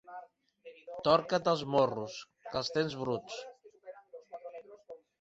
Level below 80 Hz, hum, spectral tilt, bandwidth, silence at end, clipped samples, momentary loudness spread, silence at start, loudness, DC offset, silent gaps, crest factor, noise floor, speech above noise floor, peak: -70 dBFS; none; -5 dB/octave; 8 kHz; 0.25 s; under 0.1%; 24 LU; 0.05 s; -32 LUFS; under 0.1%; none; 24 dB; -56 dBFS; 25 dB; -12 dBFS